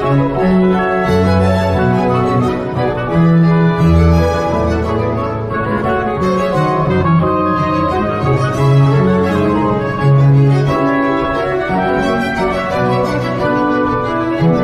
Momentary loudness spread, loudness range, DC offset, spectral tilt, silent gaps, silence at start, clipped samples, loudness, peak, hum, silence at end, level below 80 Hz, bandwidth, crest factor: 6 LU; 2 LU; under 0.1%; -8 dB/octave; none; 0 s; under 0.1%; -13 LUFS; 0 dBFS; none; 0 s; -30 dBFS; 10.5 kHz; 12 dB